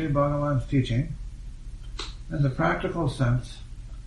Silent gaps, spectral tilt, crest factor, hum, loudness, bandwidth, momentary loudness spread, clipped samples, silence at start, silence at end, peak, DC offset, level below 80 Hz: none; -7.5 dB/octave; 18 dB; none; -27 LUFS; 11.5 kHz; 19 LU; under 0.1%; 0 s; 0 s; -8 dBFS; under 0.1%; -38 dBFS